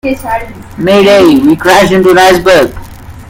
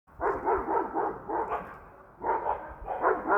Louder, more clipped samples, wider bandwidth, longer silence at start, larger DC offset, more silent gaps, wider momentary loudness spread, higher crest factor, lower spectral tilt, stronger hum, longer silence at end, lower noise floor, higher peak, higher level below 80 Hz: first, -6 LUFS vs -31 LUFS; first, 3% vs under 0.1%; first, 17 kHz vs 5.8 kHz; about the same, 0.05 s vs 0.1 s; neither; neither; first, 12 LU vs 9 LU; second, 6 dB vs 18 dB; second, -5 dB/octave vs -8.5 dB/octave; neither; about the same, 0.05 s vs 0 s; second, -26 dBFS vs -50 dBFS; first, 0 dBFS vs -12 dBFS; first, -32 dBFS vs -52 dBFS